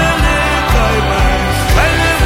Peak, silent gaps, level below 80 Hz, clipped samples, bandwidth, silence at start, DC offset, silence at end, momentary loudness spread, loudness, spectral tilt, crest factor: 0 dBFS; none; -16 dBFS; under 0.1%; 16.5 kHz; 0 s; under 0.1%; 0 s; 2 LU; -12 LUFS; -4.5 dB/octave; 10 dB